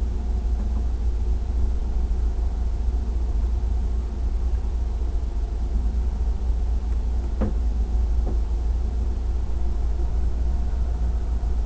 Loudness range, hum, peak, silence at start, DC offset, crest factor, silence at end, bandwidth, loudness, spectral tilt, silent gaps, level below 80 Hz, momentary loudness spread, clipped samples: 1 LU; none; -12 dBFS; 0 s; under 0.1%; 12 dB; 0 s; 8 kHz; -27 LUFS; -8.5 dB/octave; none; -22 dBFS; 2 LU; under 0.1%